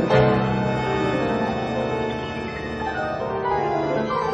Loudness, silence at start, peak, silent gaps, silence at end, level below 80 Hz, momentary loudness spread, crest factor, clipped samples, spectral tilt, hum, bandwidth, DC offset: -23 LUFS; 0 s; -4 dBFS; none; 0 s; -42 dBFS; 8 LU; 18 dB; under 0.1%; -7 dB/octave; none; 9.2 kHz; under 0.1%